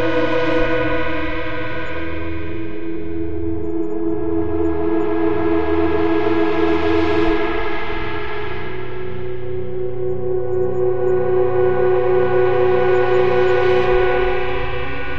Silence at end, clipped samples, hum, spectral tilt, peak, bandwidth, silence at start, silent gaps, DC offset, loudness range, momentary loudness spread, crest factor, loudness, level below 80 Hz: 0 s; under 0.1%; none; -8 dB/octave; -4 dBFS; 6.6 kHz; 0 s; none; 10%; 8 LU; 11 LU; 14 dB; -19 LUFS; -36 dBFS